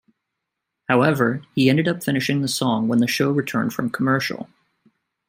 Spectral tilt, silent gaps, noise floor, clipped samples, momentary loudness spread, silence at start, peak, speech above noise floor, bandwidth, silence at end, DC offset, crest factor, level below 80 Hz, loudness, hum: -5.5 dB/octave; none; -81 dBFS; under 0.1%; 7 LU; 0.9 s; -2 dBFS; 61 dB; 16 kHz; 0.85 s; under 0.1%; 20 dB; -64 dBFS; -20 LUFS; none